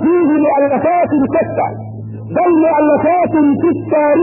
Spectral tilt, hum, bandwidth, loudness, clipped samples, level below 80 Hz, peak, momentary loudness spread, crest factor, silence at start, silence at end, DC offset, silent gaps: -14 dB/octave; none; 2.9 kHz; -13 LUFS; under 0.1%; -50 dBFS; -2 dBFS; 9 LU; 10 dB; 0 s; 0 s; under 0.1%; none